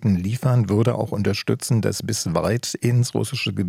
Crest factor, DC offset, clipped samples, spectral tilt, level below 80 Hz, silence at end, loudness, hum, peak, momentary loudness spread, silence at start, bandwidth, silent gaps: 16 dB; under 0.1%; under 0.1%; -5.5 dB/octave; -56 dBFS; 0 s; -22 LUFS; none; -6 dBFS; 4 LU; 0 s; 15.5 kHz; none